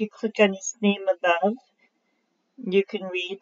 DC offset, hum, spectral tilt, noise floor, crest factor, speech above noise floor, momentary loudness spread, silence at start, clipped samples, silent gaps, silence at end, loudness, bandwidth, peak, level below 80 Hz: under 0.1%; none; -3.5 dB/octave; -72 dBFS; 20 dB; 48 dB; 8 LU; 0 s; under 0.1%; none; 0.05 s; -24 LUFS; 7.6 kHz; -6 dBFS; -78 dBFS